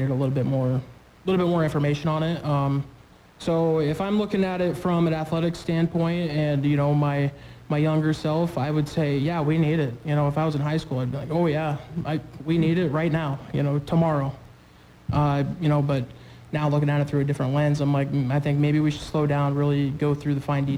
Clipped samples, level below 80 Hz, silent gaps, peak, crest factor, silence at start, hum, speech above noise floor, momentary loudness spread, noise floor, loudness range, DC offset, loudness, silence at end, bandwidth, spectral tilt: under 0.1%; -50 dBFS; none; -12 dBFS; 12 dB; 0 s; none; 28 dB; 6 LU; -51 dBFS; 2 LU; under 0.1%; -24 LUFS; 0 s; 19.5 kHz; -8 dB/octave